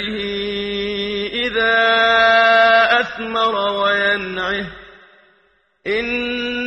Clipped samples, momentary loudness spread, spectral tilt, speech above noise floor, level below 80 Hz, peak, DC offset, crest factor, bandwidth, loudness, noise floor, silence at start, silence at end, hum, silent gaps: under 0.1%; 11 LU; -4 dB/octave; 42 dB; -48 dBFS; -2 dBFS; under 0.1%; 16 dB; 8.8 kHz; -16 LUFS; -59 dBFS; 0 s; 0 s; none; none